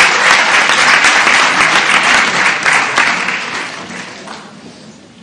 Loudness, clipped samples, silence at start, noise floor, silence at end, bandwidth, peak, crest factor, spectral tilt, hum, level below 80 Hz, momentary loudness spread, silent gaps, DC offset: -8 LUFS; 0.3%; 0 s; -36 dBFS; 0.3 s; 16 kHz; 0 dBFS; 12 dB; -0.5 dB/octave; none; -52 dBFS; 18 LU; none; under 0.1%